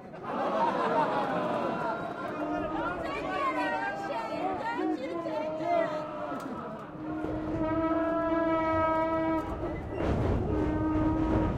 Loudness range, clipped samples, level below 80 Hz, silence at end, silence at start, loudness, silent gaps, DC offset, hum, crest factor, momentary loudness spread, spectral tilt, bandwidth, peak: 4 LU; under 0.1%; -44 dBFS; 0 s; 0 s; -31 LUFS; none; under 0.1%; none; 14 dB; 8 LU; -7.5 dB/octave; 9.8 kHz; -16 dBFS